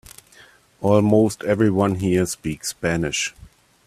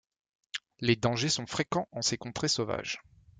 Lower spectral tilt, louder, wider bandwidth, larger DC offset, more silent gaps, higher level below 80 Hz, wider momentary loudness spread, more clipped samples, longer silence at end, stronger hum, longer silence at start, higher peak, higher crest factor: first, -5.5 dB/octave vs -3.5 dB/octave; first, -20 LUFS vs -31 LUFS; first, 15 kHz vs 9.6 kHz; neither; neither; first, -50 dBFS vs -62 dBFS; second, 9 LU vs 13 LU; neither; first, 0.55 s vs 0.4 s; neither; first, 0.8 s vs 0.55 s; first, -2 dBFS vs -10 dBFS; about the same, 18 dB vs 22 dB